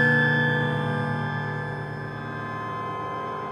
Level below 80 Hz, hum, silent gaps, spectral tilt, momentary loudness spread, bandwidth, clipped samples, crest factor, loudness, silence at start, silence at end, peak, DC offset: -58 dBFS; none; none; -7.5 dB/octave; 12 LU; 9.8 kHz; under 0.1%; 16 dB; -26 LUFS; 0 s; 0 s; -10 dBFS; under 0.1%